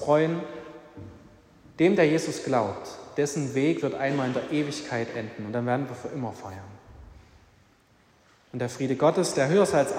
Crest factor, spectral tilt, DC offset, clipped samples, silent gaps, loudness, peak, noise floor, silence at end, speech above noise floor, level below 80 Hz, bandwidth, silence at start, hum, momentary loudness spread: 18 dB; -5.5 dB/octave; under 0.1%; under 0.1%; none; -26 LUFS; -8 dBFS; -61 dBFS; 0 s; 35 dB; -62 dBFS; 16 kHz; 0 s; none; 20 LU